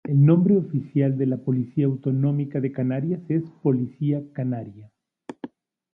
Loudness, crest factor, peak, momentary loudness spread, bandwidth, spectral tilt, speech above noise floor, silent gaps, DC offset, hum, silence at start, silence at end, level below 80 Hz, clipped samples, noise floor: -23 LUFS; 16 dB; -6 dBFS; 20 LU; 3.5 kHz; -12 dB/octave; 21 dB; none; under 0.1%; none; 0.05 s; 0.45 s; -66 dBFS; under 0.1%; -43 dBFS